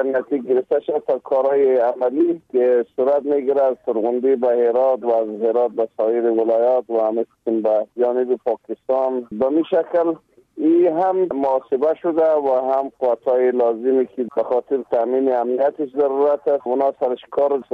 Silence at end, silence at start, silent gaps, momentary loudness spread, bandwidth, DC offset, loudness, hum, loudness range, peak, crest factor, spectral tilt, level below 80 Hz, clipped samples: 0.1 s; 0 s; none; 5 LU; 4.6 kHz; under 0.1%; -19 LUFS; none; 2 LU; -8 dBFS; 10 dB; -8.5 dB/octave; -68 dBFS; under 0.1%